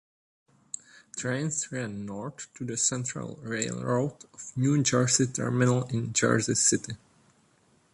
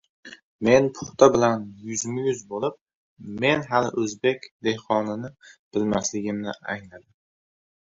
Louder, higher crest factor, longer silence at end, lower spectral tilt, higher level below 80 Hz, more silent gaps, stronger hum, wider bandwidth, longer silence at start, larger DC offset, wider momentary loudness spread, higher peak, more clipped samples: second, -27 LUFS vs -24 LUFS; about the same, 20 dB vs 22 dB; about the same, 0.95 s vs 0.95 s; about the same, -4 dB/octave vs -4.5 dB/octave; second, -64 dBFS vs -58 dBFS; second, none vs 0.43-0.59 s, 2.81-2.86 s, 2.95-3.17 s, 4.51-4.59 s, 5.59-5.71 s; neither; first, 11.5 kHz vs 8 kHz; first, 1.15 s vs 0.25 s; neither; first, 18 LU vs 14 LU; second, -10 dBFS vs -2 dBFS; neither